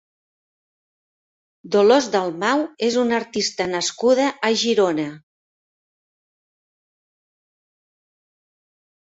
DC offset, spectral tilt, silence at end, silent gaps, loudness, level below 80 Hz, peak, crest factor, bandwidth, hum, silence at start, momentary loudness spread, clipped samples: under 0.1%; -3.5 dB/octave; 4 s; none; -19 LUFS; -66 dBFS; -2 dBFS; 20 dB; 8 kHz; none; 1.65 s; 7 LU; under 0.1%